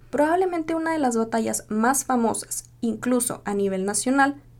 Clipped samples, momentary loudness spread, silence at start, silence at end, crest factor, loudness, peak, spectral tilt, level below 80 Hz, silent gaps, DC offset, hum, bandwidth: under 0.1%; 6 LU; 0.15 s; 0.2 s; 16 dB; -23 LUFS; -6 dBFS; -4 dB/octave; -54 dBFS; none; under 0.1%; none; 18 kHz